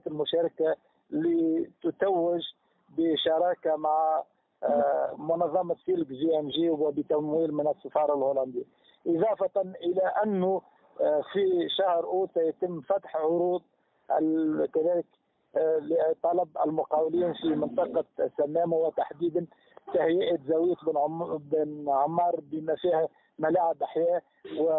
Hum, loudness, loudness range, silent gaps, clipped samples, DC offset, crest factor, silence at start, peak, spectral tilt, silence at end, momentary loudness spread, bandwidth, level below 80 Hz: none; -28 LUFS; 1 LU; none; under 0.1%; under 0.1%; 16 dB; 0.05 s; -12 dBFS; -10 dB/octave; 0 s; 6 LU; 4.1 kHz; -72 dBFS